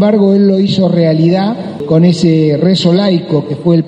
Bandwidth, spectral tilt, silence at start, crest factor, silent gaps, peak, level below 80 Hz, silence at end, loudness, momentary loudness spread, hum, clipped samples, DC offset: 9.4 kHz; -8 dB/octave; 0 s; 10 dB; none; 0 dBFS; -50 dBFS; 0 s; -10 LUFS; 5 LU; none; under 0.1%; under 0.1%